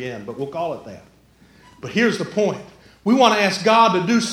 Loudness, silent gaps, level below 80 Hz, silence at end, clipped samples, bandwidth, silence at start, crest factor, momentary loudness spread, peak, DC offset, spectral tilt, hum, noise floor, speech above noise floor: -18 LUFS; none; -60 dBFS; 0 s; under 0.1%; 14 kHz; 0 s; 20 dB; 16 LU; 0 dBFS; under 0.1%; -4.5 dB/octave; none; -51 dBFS; 33 dB